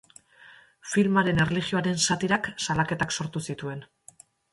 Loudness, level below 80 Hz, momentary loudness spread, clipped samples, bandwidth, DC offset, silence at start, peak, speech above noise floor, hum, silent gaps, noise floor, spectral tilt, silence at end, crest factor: -26 LUFS; -56 dBFS; 13 LU; under 0.1%; 11.5 kHz; under 0.1%; 0.45 s; -8 dBFS; 29 dB; none; none; -55 dBFS; -4 dB/octave; 0.7 s; 18 dB